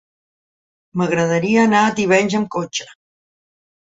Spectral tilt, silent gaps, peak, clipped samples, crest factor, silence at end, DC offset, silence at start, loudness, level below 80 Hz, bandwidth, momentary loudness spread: -5 dB/octave; none; -2 dBFS; under 0.1%; 18 dB; 1.05 s; under 0.1%; 0.95 s; -17 LUFS; -60 dBFS; 7.8 kHz; 11 LU